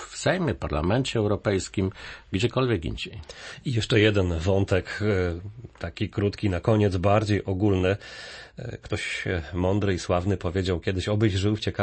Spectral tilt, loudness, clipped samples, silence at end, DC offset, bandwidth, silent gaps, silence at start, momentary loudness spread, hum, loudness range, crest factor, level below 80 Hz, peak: -6 dB/octave; -25 LUFS; under 0.1%; 0 s; under 0.1%; 8.8 kHz; none; 0 s; 15 LU; none; 2 LU; 18 dB; -44 dBFS; -8 dBFS